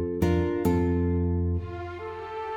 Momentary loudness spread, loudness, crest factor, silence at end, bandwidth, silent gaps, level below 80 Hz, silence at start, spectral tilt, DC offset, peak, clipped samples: 11 LU; -27 LUFS; 16 dB; 0 s; 16 kHz; none; -46 dBFS; 0 s; -8.5 dB/octave; under 0.1%; -10 dBFS; under 0.1%